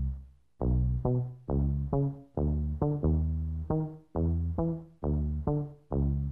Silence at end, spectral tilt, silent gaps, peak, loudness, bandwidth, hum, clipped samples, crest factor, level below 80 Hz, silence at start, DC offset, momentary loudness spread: 0 s; -13.5 dB/octave; none; -16 dBFS; -32 LUFS; 1.8 kHz; none; under 0.1%; 14 dB; -36 dBFS; 0 s; under 0.1%; 6 LU